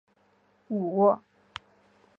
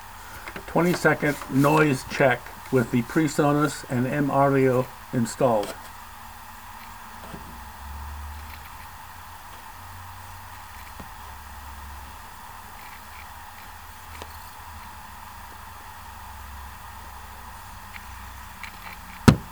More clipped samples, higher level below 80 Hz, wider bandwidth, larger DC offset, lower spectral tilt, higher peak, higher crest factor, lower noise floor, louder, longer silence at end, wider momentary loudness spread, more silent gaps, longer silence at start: neither; second, -72 dBFS vs -46 dBFS; second, 7.4 kHz vs over 20 kHz; second, under 0.1% vs 0.3%; first, -8.5 dB/octave vs -6 dB/octave; second, -10 dBFS vs 0 dBFS; second, 20 dB vs 26 dB; first, -66 dBFS vs -42 dBFS; second, -26 LUFS vs -23 LUFS; first, 1 s vs 0 s; about the same, 21 LU vs 20 LU; neither; first, 0.7 s vs 0 s